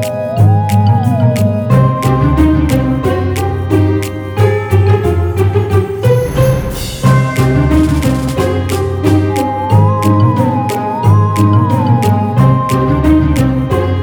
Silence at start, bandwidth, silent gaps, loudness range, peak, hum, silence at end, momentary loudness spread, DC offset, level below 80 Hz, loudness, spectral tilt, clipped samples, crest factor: 0 s; over 20 kHz; none; 2 LU; 0 dBFS; none; 0 s; 4 LU; under 0.1%; -24 dBFS; -12 LUFS; -7.5 dB/octave; under 0.1%; 10 dB